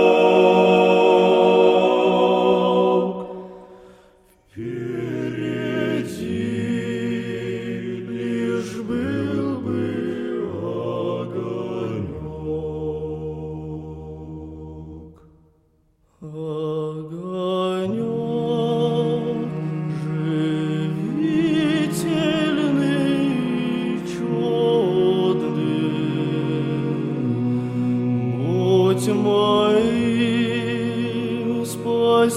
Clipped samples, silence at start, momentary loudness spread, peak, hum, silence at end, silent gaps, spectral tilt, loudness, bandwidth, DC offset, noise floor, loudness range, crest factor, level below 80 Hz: under 0.1%; 0 s; 15 LU; -4 dBFS; none; 0 s; none; -6.5 dB/octave; -21 LUFS; 14.5 kHz; under 0.1%; -61 dBFS; 10 LU; 18 dB; -54 dBFS